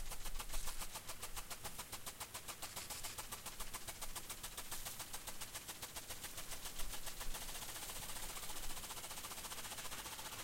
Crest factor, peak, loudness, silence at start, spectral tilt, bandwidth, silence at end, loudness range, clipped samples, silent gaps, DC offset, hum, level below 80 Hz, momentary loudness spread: 18 dB; -28 dBFS; -47 LUFS; 0 s; -1 dB/octave; 17 kHz; 0 s; 1 LU; under 0.1%; none; under 0.1%; none; -52 dBFS; 2 LU